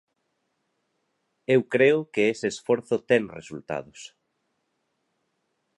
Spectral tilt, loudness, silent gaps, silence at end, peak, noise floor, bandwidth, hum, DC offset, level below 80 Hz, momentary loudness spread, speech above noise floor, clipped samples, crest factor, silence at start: -5.5 dB/octave; -24 LUFS; none; 1.7 s; -6 dBFS; -76 dBFS; 11 kHz; none; under 0.1%; -70 dBFS; 18 LU; 52 dB; under 0.1%; 20 dB; 1.5 s